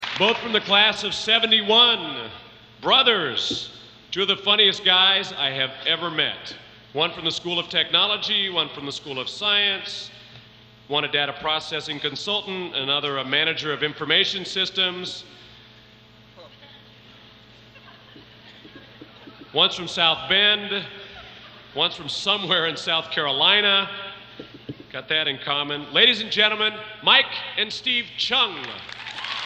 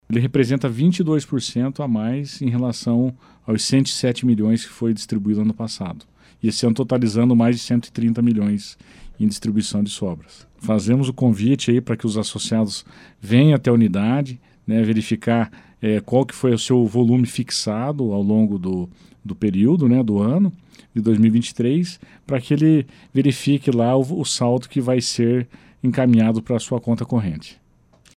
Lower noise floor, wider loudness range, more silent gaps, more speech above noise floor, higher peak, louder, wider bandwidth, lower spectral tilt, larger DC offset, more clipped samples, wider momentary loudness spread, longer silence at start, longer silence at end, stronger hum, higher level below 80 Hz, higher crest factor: second, -50 dBFS vs -54 dBFS; first, 6 LU vs 2 LU; neither; second, 28 dB vs 35 dB; about the same, -2 dBFS vs -4 dBFS; about the same, -20 LUFS vs -19 LUFS; second, 9.2 kHz vs 12 kHz; second, -2.5 dB/octave vs -6.5 dB/octave; neither; neither; first, 18 LU vs 10 LU; about the same, 0 s vs 0.1 s; second, 0 s vs 0.65 s; first, 60 Hz at -55 dBFS vs none; second, -62 dBFS vs -54 dBFS; first, 22 dB vs 16 dB